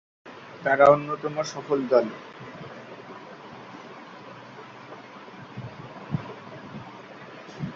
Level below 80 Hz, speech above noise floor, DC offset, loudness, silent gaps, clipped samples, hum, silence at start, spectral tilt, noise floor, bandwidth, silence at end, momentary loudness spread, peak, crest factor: -64 dBFS; 21 dB; under 0.1%; -24 LUFS; none; under 0.1%; none; 0.25 s; -6 dB/octave; -44 dBFS; 7.6 kHz; 0 s; 22 LU; -4 dBFS; 24 dB